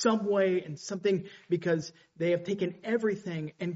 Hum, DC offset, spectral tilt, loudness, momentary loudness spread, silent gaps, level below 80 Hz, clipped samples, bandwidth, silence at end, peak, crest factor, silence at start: none; under 0.1%; -5.5 dB/octave; -31 LUFS; 9 LU; none; -74 dBFS; under 0.1%; 8 kHz; 0 s; -12 dBFS; 18 dB; 0 s